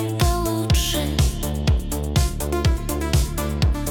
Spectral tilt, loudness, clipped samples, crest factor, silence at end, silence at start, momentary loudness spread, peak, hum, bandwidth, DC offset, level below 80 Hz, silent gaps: -5 dB/octave; -22 LUFS; under 0.1%; 14 dB; 0 s; 0 s; 3 LU; -8 dBFS; none; over 20 kHz; under 0.1%; -24 dBFS; none